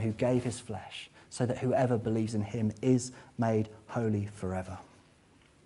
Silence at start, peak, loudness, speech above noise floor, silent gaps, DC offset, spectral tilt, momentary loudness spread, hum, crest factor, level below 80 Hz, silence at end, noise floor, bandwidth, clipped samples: 0 s; -14 dBFS; -32 LUFS; 31 dB; none; under 0.1%; -7 dB/octave; 13 LU; none; 18 dB; -62 dBFS; 0.8 s; -62 dBFS; 11.5 kHz; under 0.1%